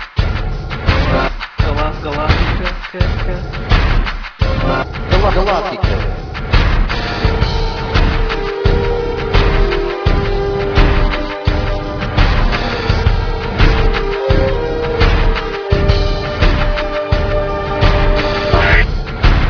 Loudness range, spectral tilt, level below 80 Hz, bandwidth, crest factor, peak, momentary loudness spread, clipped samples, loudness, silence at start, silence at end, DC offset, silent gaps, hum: 2 LU; -6.5 dB/octave; -16 dBFS; 5.4 kHz; 14 dB; 0 dBFS; 6 LU; under 0.1%; -16 LUFS; 0 s; 0 s; under 0.1%; none; none